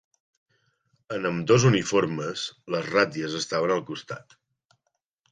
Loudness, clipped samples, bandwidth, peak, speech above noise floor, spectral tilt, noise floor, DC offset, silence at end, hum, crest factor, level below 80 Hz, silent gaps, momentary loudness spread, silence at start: -25 LUFS; under 0.1%; 9.6 kHz; -6 dBFS; 54 dB; -5 dB/octave; -78 dBFS; under 0.1%; 1.1 s; none; 20 dB; -62 dBFS; none; 16 LU; 1.1 s